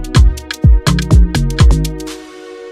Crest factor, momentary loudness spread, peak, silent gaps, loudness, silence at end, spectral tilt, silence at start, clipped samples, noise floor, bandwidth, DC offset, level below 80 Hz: 12 dB; 18 LU; 0 dBFS; none; -12 LUFS; 0 s; -6 dB/octave; 0 s; under 0.1%; -31 dBFS; 13.5 kHz; under 0.1%; -12 dBFS